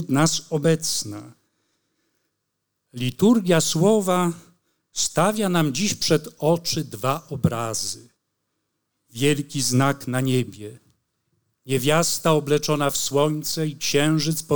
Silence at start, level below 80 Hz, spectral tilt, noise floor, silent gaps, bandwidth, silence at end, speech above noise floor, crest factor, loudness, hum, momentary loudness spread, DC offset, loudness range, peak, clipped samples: 0 s; -58 dBFS; -4.5 dB/octave; -77 dBFS; none; over 20 kHz; 0 s; 56 dB; 18 dB; -22 LUFS; none; 10 LU; 0.7%; 4 LU; -6 dBFS; under 0.1%